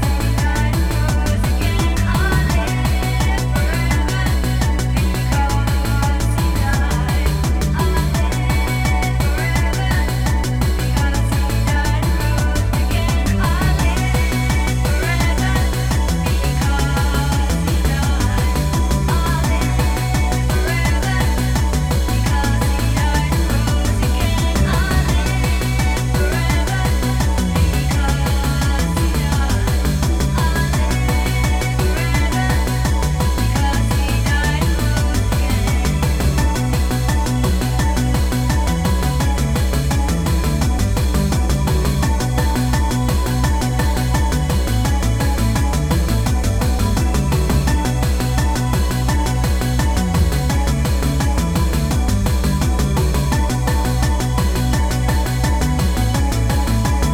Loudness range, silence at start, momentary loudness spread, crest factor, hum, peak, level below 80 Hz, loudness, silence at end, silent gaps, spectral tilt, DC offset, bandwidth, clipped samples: 0 LU; 0 s; 1 LU; 12 dB; none; -4 dBFS; -18 dBFS; -18 LUFS; 0 s; none; -5.5 dB/octave; under 0.1%; 16.5 kHz; under 0.1%